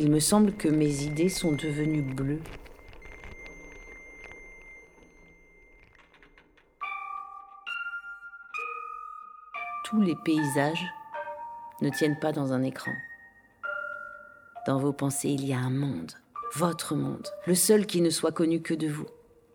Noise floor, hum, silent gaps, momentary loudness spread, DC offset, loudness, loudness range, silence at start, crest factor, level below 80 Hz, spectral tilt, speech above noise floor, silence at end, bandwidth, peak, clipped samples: -60 dBFS; none; none; 21 LU; under 0.1%; -29 LUFS; 17 LU; 0 s; 20 dB; -56 dBFS; -5 dB/octave; 33 dB; 0.4 s; 18.5 kHz; -8 dBFS; under 0.1%